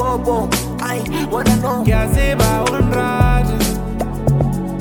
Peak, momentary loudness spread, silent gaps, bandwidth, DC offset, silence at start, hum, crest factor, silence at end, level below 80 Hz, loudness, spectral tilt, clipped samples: 0 dBFS; 6 LU; none; 20 kHz; under 0.1%; 0 s; none; 16 dB; 0 s; -22 dBFS; -17 LUFS; -5.5 dB/octave; under 0.1%